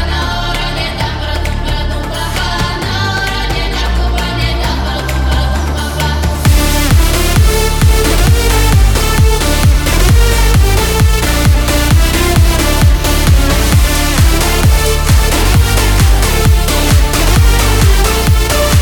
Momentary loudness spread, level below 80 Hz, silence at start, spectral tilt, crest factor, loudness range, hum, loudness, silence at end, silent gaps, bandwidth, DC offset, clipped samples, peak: 6 LU; -12 dBFS; 0 s; -4.5 dB/octave; 10 dB; 5 LU; none; -11 LUFS; 0 s; none; 19 kHz; under 0.1%; under 0.1%; 0 dBFS